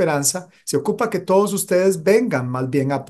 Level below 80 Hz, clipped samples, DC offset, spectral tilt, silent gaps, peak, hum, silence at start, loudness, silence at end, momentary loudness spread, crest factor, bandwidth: -64 dBFS; under 0.1%; under 0.1%; -5 dB/octave; none; -4 dBFS; none; 0 s; -19 LUFS; 0.05 s; 6 LU; 14 dB; 13 kHz